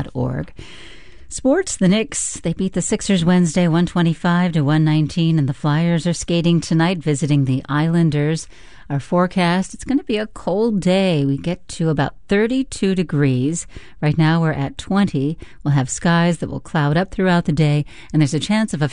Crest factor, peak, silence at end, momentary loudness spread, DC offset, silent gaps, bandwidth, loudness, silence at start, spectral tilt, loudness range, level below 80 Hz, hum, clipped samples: 14 dB; -4 dBFS; 0 s; 7 LU; 0.5%; none; 11 kHz; -18 LUFS; 0 s; -6 dB/octave; 2 LU; -42 dBFS; none; under 0.1%